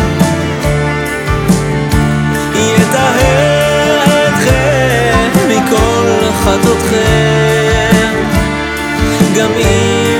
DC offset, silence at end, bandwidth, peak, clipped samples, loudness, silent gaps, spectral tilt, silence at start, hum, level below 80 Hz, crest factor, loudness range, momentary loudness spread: under 0.1%; 0 s; 18.5 kHz; 0 dBFS; under 0.1%; -10 LUFS; none; -5 dB/octave; 0 s; none; -24 dBFS; 10 dB; 2 LU; 4 LU